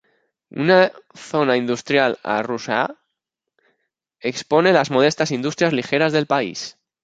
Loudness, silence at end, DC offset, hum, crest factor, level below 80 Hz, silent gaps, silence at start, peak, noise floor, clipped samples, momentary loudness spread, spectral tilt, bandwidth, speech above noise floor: -19 LUFS; 0.35 s; under 0.1%; none; 18 dB; -66 dBFS; none; 0.55 s; -2 dBFS; -81 dBFS; under 0.1%; 12 LU; -5 dB/octave; 9.2 kHz; 62 dB